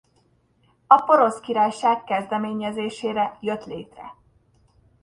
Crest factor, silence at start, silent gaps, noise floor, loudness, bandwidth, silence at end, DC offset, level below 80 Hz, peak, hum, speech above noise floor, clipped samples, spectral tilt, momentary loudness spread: 24 dB; 0.9 s; none; -63 dBFS; -21 LUFS; 11 kHz; 0.9 s; under 0.1%; -64 dBFS; 0 dBFS; none; 41 dB; under 0.1%; -5 dB/octave; 20 LU